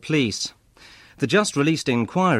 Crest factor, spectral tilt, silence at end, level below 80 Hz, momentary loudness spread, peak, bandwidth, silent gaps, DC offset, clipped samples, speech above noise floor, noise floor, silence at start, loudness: 16 dB; -5 dB/octave; 0 s; -58 dBFS; 9 LU; -6 dBFS; 14 kHz; none; under 0.1%; under 0.1%; 29 dB; -49 dBFS; 0.05 s; -22 LUFS